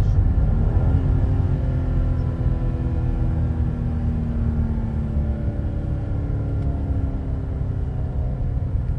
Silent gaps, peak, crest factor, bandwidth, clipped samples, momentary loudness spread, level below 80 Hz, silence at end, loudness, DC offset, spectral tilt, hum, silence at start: none; -8 dBFS; 14 dB; 4.1 kHz; under 0.1%; 6 LU; -24 dBFS; 0 s; -24 LUFS; under 0.1%; -10.5 dB/octave; none; 0 s